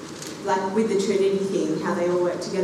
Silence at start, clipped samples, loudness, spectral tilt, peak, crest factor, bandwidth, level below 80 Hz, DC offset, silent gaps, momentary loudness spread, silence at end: 0 s; under 0.1%; -23 LUFS; -5.5 dB/octave; -10 dBFS; 12 dB; 13.5 kHz; -66 dBFS; under 0.1%; none; 4 LU; 0 s